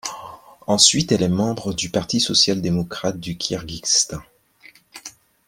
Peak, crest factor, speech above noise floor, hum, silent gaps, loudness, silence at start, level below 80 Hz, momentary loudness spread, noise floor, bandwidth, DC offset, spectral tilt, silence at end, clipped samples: 0 dBFS; 22 dB; 31 dB; none; none; -19 LUFS; 0.05 s; -50 dBFS; 24 LU; -51 dBFS; 16.5 kHz; under 0.1%; -3 dB/octave; 0.4 s; under 0.1%